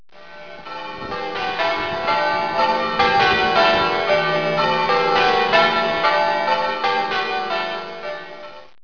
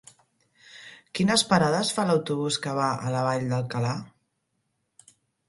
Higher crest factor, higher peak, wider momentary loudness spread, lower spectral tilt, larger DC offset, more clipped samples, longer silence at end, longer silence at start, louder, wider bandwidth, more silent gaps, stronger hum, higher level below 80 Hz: second, 16 dB vs 22 dB; about the same, -4 dBFS vs -4 dBFS; about the same, 16 LU vs 15 LU; about the same, -4 dB/octave vs -4.5 dB/octave; first, 0.8% vs under 0.1%; neither; second, 0.2 s vs 1.4 s; second, 0.2 s vs 0.75 s; first, -18 LUFS vs -25 LUFS; second, 5.4 kHz vs 11.5 kHz; neither; neither; first, -50 dBFS vs -62 dBFS